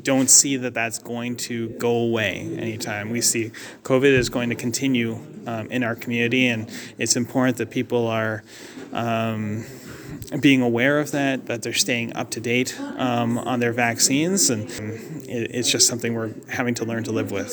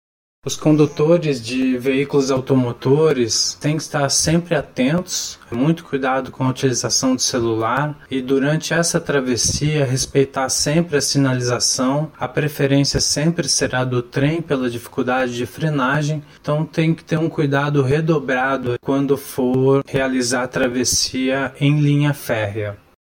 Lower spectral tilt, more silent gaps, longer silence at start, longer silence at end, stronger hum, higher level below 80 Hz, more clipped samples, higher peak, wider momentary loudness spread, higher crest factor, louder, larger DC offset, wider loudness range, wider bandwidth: second, -3 dB/octave vs -4.5 dB/octave; neither; second, 0 s vs 0.45 s; second, 0 s vs 0.3 s; neither; second, -56 dBFS vs -46 dBFS; neither; first, 0 dBFS vs -4 dBFS; first, 14 LU vs 6 LU; first, 22 dB vs 16 dB; second, -21 LUFS vs -18 LUFS; neither; about the same, 3 LU vs 2 LU; first, over 20 kHz vs 17 kHz